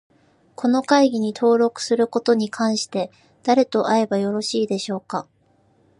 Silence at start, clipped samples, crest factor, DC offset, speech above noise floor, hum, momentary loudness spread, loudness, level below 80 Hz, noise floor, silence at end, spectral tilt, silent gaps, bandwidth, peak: 0.6 s; under 0.1%; 20 dB; under 0.1%; 40 dB; none; 11 LU; -20 LUFS; -72 dBFS; -60 dBFS; 0.8 s; -4.5 dB/octave; none; 11.5 kHz; -2 dBFS